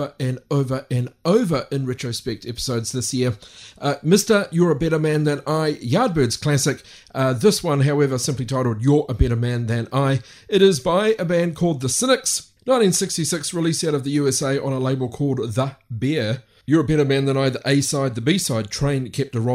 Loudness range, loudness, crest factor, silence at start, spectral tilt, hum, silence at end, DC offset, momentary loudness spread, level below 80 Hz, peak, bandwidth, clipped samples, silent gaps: 3 LU; -20 LUFS; 18 dB; 0 s; -5 dB/octave; none; 0 s; under 0.1%; 8 LU; -40 dBFS; -2 dBFS; 16 kHz; under 0.1%; none